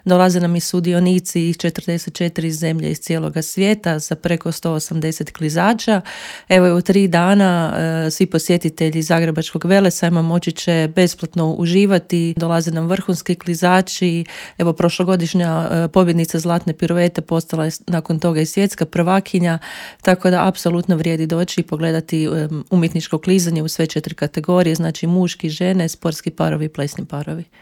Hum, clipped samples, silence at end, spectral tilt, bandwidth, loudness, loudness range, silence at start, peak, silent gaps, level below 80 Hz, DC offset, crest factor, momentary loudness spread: none; under 0.1%; 0.2 s; -6 dB/octave; 16.5 kHz; -17 LUFS; 3 LU; 0.05 s; 0 dBFS; none; -52 dBFS; under 0.1%; 16 dB; 8 LU